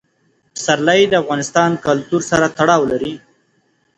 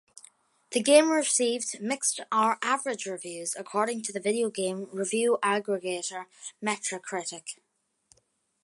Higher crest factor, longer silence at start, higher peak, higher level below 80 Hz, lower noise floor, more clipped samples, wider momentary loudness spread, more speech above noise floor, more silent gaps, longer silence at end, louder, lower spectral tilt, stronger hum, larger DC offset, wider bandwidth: second, 16 dB vs 22 dB; second, 0.55 s vs 0.7 s; first, 0 dBFS vs -6 dBFS; first, -52 dBFS vs -84 dBFS; second, -61 dBFS vs -71 dBFS; neither; about the same, 11 LU vs 13 LU; about the same, 46 dB vs 43 dB; neither; second, 0.8 s vs 1.1 s; first, -15 LUFS vs -27 LUFS; first, -4 dB/octave vs -2.5 dB/octave; neither; neither; about the same, 10.5 kHz vs 11.5 kHz